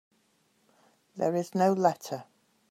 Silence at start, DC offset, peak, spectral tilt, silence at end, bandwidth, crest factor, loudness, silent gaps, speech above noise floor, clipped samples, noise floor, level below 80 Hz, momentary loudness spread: 1.15 s; under 0.1%; -10 dBFS; -6.5 dB/octave; 0.5 s; 15 kHz; 20 dB; -29 LUFS; none; 43 dB; under 0.1%; -70 dBFS; -82 dBFS; 16 LU